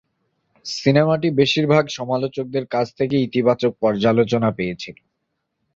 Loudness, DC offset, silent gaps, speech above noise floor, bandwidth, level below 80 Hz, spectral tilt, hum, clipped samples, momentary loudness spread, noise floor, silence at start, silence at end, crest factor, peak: -19 LUFS; under 0.1%; none; 56 dB; 7.8 kHz; -56 dBFS; -6.5 dB/octave; none; under 0.1%; 10 LU; -75 dBFS; 0.65 s; 0.85 s; 18 dB; -2 dBFS